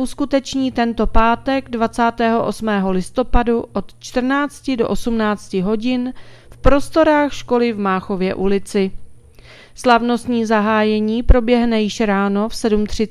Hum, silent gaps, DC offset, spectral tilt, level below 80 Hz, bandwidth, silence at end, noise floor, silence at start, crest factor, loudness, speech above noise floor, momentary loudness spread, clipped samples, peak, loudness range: none; none; under 0.1%; -6 dB/octave; -28 dBFS; 13 kHz; 0 s; -42 dBFS; 0 s; 16 dB; -18 LUFS; 26 dB; 6 LU; under 0.1%; 0 dBFS; 3 LU